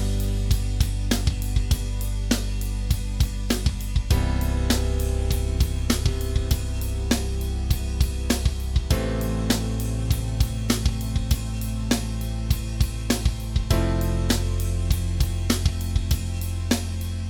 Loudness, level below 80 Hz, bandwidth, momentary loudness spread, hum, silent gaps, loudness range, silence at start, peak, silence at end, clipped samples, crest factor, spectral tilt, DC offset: -25 LUFS; -26 dBFS; 19.5 kHz; 4 LU; none; none; 1 LU; 0 s; -4 dBFS; 0 s; under 0.1%; 18 dB; -5 dB/octave; under 0.1%